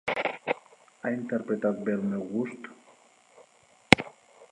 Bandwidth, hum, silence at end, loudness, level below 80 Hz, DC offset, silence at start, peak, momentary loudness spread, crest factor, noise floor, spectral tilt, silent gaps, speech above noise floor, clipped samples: 11.5 kHz; none; 0.05 s; -28 LUFS; -58 dBFS; under 0.1%; 0.05 s; 0 dBFS; 14 LU; 30 dB; -60 dBFS; -5 dB/octave; none; 30 dB; under 0.1%